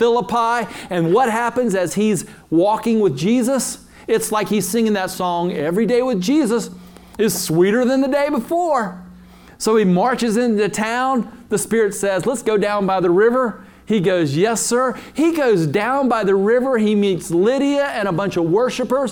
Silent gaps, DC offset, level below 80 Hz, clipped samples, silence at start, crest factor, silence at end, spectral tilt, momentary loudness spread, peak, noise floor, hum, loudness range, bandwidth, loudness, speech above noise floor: none; under 0.1%; -52 dBFS; under 0.1%; 0 s; 14 dB; 0 s; -5 dB/octave; 6 LU; -4 dBFS; -43 dBFS; none; 2 LU; 19.5 kHz; -18 LUFS; 25 dB